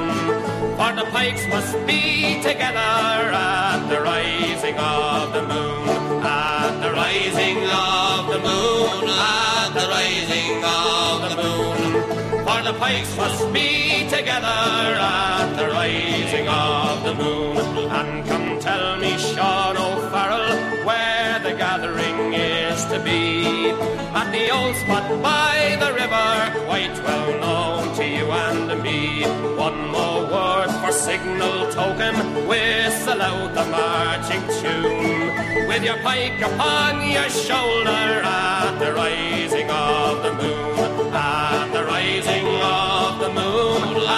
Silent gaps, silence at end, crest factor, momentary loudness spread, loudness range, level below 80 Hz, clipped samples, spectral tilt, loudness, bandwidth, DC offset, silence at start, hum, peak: none; 0 s; 14 dB; 4 LU; 2 LU; -46 dBFS; under 0.1%; -3.5 dB/octave; -20 LUFS; 15.5 kHz; under 0.1%; 0 s; none; -6 dBFS